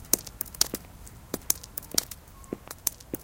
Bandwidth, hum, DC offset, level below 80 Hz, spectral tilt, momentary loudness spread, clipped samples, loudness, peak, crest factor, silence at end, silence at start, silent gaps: 17 kHz; none; under 0.1%; -52 dBFS; -1.5 dB/octave; 16 LU; under 0.1%; -29 LUFS; 0 dBFS; 34 dB; 0 s; 0 s; none